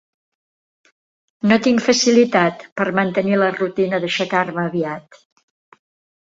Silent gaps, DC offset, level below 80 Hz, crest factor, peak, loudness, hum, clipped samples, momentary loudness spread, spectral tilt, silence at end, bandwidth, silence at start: 2.72-2.76 s; under 0.1%; -62 dBFS; 18 dB; -2 dBFS; -18 LUFS; none; under 0.1%; 9 LU; -4.5 dB/octave; 1.3 s; 7.8 kHz; 1.45 s